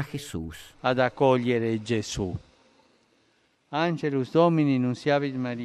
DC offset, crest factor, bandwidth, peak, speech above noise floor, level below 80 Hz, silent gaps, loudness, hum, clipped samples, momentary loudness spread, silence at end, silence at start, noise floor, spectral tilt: under 0.1%; 18 dB; 14 kHz; -8 dBFS; 42 dB; -54 dBFS; none; -26 LUFS; none; under 0.1%; 12 LU; 0 s; 0 s; -67 dBFS; -6.5 dB/octave